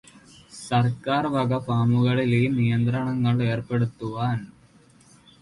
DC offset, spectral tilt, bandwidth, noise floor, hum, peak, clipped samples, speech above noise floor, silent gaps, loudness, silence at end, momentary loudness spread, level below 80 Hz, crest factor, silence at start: under 0.1%; -7.5 dB/octave; 11.5 kHz; -55 dBFS; none; -10 dBFS; under 0.1%; 32 dB; none; -24 LUFS; 0.95 s; 7 LU; -56 dBFS; 14 dB; 0.55 s